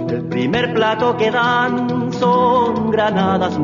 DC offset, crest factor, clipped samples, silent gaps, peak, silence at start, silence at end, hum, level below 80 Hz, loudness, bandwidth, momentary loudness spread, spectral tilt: under 0.1%; 12 dB; under 0.1%; none; -4 dBFS; 0 s; 0 s; none; -50 dBFS; -16 LUFS; 7.4 kHz; 5 LU; -6.5 dB/octave